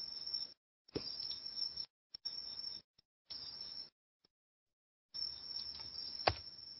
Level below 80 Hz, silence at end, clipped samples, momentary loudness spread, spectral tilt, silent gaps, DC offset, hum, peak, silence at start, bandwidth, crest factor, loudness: -66 dBFS; 0 s; under 0.1%; 11 LU; -5 dB/octave; 0.57-0.85 s, 1.90-2.10 s, 2.84-2.94 s, 3.05-3.25 s, 3.92-4.20 s, 4.30-4.67 s, 4.73-5.09 s; under 0.1%; none; -12 dBFS; 0 s; 6 kHz; 34 dB; -43 LUFS